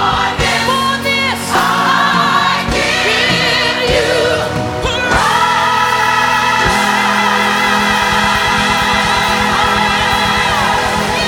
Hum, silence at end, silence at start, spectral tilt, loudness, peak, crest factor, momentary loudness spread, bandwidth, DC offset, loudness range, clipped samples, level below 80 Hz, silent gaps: none; 0 s; 0 s; -3 dB/octave; -12 LUFS; 0 dBFS; 12 dB; 3 LU; 19.5 kHz; under 0.1%; 1 LU; under 0.1%; -32 dBFS; none